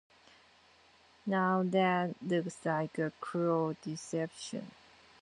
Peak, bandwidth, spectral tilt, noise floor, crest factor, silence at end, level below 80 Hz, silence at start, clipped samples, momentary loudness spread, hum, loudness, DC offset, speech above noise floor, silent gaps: -16 dBFS; 11 kHz; -6 dB/octave; -64 dBFS; 18 dB; 0.5 s; -78 dBFS; 1.25 s; under 0.1%; 13 LU; none; -34 LUFS; under 0.1%; 30 dB; none